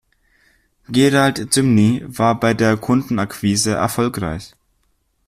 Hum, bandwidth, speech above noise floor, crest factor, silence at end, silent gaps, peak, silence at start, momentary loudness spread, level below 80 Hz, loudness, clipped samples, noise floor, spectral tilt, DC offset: none; 15.5 kHz; 48 dB; 16 dB; 0.8 s; none; -2 dBFS; 0.9 s; 8 LU; -48 dBFS; -17 LUFS; under 0.1%; -64 dBFS; -5 dB/octave; under 0.1%